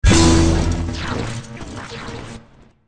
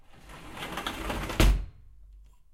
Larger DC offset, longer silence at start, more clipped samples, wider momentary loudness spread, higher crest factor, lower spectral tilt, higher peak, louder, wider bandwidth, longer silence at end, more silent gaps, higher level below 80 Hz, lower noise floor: neither; second, 0 s vs 0.15 s; neither; about the same, 21 LU vs 21 LU; second, 16 dB vs 22 dB; about the same, -5 dB/octave vs -4.5 dB/octave; first, -2 dBFS vs -8 dBFS; first, -17 LUFS vs -30 LUFS; second, 10.5 kHz vs 16.5 kHz; second, 0 s vs 0.35 s; neither; first, -24 dBFS vs -32 dBFS; second, -47 dBFS vs -52 dBFS